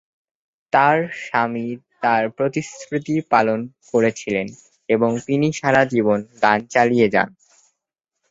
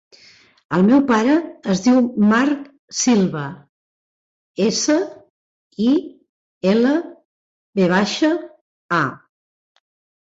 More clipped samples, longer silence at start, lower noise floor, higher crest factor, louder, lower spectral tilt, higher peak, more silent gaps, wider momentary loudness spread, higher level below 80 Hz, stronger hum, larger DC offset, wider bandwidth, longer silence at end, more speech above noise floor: neither; about the same, 0.75 s vs 0.7 s; first, -81 dBFS vs -50 dBFS; about the same, 18 dB vs 16 dB; about the same, -19 LUFS vs -18 LUFS; about the same, -6 dB/octave vs -5 dB/octave; about the same, -2 dBFS vs -4 dBFS; second, none vs 2.79-2.88 s, 3.69-4.54 s, 5.30-5.71 s, 6.29-6.61 s, 7.25-7.73 s, 8.61-8.89 s; about the same, 11 LU vs 13 LU; about the same, -60 dBFS vs -60 dBFS; neither; neither; about the same, 8 kHz vs 8 kHz; about the same, 1 s vs 1.1 s; first, 62 dB vs 33 dB